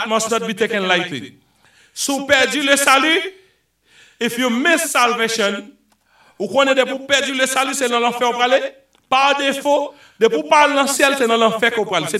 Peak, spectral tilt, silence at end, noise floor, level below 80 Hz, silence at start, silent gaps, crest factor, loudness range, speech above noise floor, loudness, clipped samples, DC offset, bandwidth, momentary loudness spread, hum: 0 dBFS; -2 dB/octave; 0 s; -58 dBFS; -62 dBFS; 0 s; none; 18 dB; 2 LU; 41 dB; -16 LUFS; under 0.1%; under 0.1%; 16 kHz; 9 LU; none